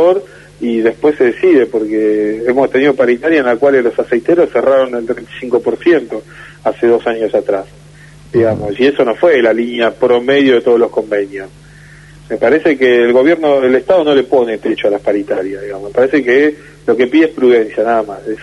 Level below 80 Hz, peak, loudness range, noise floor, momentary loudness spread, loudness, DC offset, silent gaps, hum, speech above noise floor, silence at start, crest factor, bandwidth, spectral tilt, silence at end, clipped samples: -48 dBFS; 0 dBFS; 3 LU; -37 dBFS; 9 LU; -12 LUFS; under 0.1%; none; none; 26 dB; 0 s; 12 dB; 11 kHz; -6.5 dB/octave; 0 s; under 0.1%